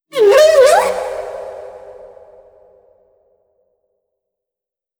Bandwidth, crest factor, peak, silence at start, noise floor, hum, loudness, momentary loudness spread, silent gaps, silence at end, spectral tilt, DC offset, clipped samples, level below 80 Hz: over 20 kHz; 16 dB; 0 dBFS; 0.15 s; -87 dBFS; none; -11 LUFS; 25 LU; none; 2.95 s; -1.5 dB/octave; under 0.1%; under 0.1%; -54 dBFS